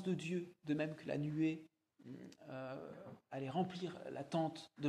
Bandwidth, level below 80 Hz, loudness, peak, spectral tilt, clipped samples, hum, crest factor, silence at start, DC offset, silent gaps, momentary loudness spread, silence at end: 11 kHz; -80 dBFS; -43 LUFS; -28 dBFS; -7 dB/octave; under 0.1%; none; 16 dB; 0 s; under 0.1%; none; 15 LU; 0 s